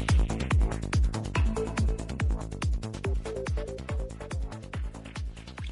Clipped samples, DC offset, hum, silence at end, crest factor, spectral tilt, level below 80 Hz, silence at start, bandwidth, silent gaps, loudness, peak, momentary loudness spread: under 0.1%; under 0.1%; none; 0 s; 14 dB; -6 dB/octave; -32 dBFS; 0 s; 11.5 kHz; none; -32 LUFS; -14 dBFS; 11 LU